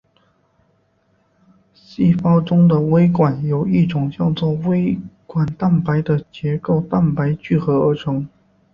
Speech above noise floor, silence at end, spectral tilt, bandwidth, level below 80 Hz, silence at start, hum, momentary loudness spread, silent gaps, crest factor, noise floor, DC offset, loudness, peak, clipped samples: 45 dB; 0.45 s; -10.5 dB/octave; 5.6 kHz; -50 dBFS; 1.9 s; none; 9 LU; none; 16 dB; -61 dBFS; under 0.1%; -18 LUFS; -2 dBFS; under 0.1%